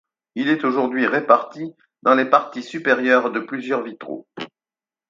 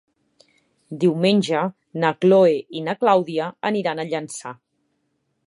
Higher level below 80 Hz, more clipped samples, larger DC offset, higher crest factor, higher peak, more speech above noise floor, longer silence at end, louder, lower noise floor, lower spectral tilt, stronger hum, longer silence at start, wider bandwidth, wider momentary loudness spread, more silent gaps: about the same, -74 dBFS vs -74 dBFS; neither; neither; about the same, 20 dB vs 18 dB; about the same, 0 dBFS vs -2 dBFS; first, over 70 dB vs 52 dB; second, 0.65 s vs 0.95 s; about the same, -19 LUFS vs -20 LUFS; first, under -90 dBFS vs -71 dBFS; about the same, -5.5 dB/octave vs -6 dB/octave; neither; second, 0.35 s vs 0.9 s; second, 7.6 kHz vs 11.5 kHz; first, 18 LU vs 13 LU; neither